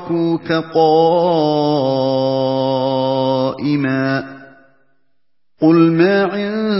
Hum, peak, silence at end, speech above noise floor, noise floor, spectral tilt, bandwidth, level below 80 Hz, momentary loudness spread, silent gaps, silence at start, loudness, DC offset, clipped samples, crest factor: none; 0 dBFS; 0 s; 60 dB; -75 dBFS; -10.5 dB/octave; 5.8 kHz; -60 dBFS; 6 LU; none; 0 s; -15 LUFS; 0.2%; under 0.1%; 14 dB